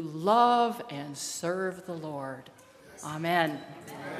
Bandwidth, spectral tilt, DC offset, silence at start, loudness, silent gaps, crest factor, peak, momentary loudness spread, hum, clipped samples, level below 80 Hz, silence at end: 15.5 kHz; -4.5 dB/octave; under 0.1%; 0 s; -29 LUFS; none; 20 dB; -10 dBFS; 18 LU; none; under 0.1%; -76 dBFS; 0 s